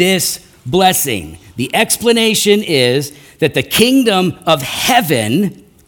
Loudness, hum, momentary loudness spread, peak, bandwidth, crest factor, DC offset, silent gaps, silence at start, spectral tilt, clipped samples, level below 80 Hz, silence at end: -13 LUFS; none; 9 LU; 0 dBFS; 19 kHz; 14 dB; under 0.1%; none; 0 s; -3.5 dB/octave; under 0.1%; -46 dBFS; 0.35 s